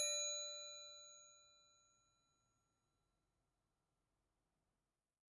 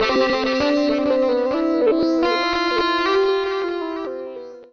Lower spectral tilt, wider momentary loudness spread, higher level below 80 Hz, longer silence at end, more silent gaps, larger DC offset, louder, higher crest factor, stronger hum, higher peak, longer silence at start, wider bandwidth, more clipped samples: second, 3.5 dB/octave vs -4.5 dB/octave; first, 21 LU vs 10 LU; second, under -90 dBFS vs -50 dBFS; first, 3.8 s vs 0.05 s; neither; neither; second, -45 LUFS vs -19 LUFS; first, 24 dB vs 12 dB; neither; second, -30 dBFS vs -8 dBFS; about the same, 0 s vs 0 s; first, 11.5 kHz vs 7 kHz; neither